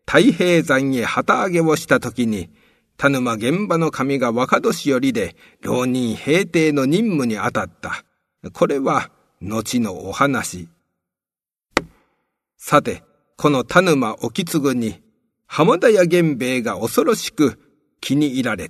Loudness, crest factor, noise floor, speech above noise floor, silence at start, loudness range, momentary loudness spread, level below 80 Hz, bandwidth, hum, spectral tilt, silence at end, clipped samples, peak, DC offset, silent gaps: -19 LUFS; 20 dB; under -90 dBFS; over 72 dB; 0.1 s; 5 LU; 13 LU; -54 dBFS; 13.5 kHz; none; -5 dB/octave; 0 s; under 0.1%; 0 dBFS; under 0.1%; none